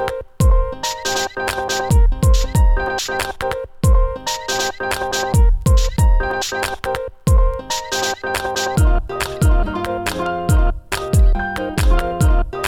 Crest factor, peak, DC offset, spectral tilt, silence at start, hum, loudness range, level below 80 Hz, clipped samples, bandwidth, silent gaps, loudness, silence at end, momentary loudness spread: 12 dB; -4 dBFS; under 0.1%; -4.5 dB/octave; 0 s; none; 1 LU; -18 dBFS; under 0.1%; 16.5 kHz; none; -19 LUFS; 0 s; 6 LU